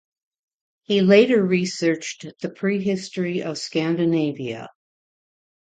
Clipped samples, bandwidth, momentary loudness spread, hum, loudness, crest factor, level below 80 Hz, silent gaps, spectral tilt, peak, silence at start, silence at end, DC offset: under 0.1%; 9.2 kHz; 17 LU; none; -21 LUFS; 20 dB; -68 dBFS; none; -5.5 dB/octave; -2 dBFS; 0.9 s; 1 s; under 0.1%